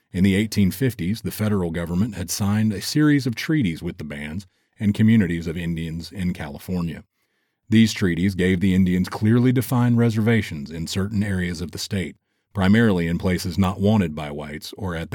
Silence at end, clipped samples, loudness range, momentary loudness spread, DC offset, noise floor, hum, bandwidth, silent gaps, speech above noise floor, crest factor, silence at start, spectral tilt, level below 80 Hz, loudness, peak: 0 s; under 0.1%; 4 LU; 13 LU; under 0.1%; -71 dBFS; none; 19 kHz; none; 50 dB; 16 dB; 0.15 s; -6.5 dB/octave; -46 dBFS; -22 LUFS; -6 dBFS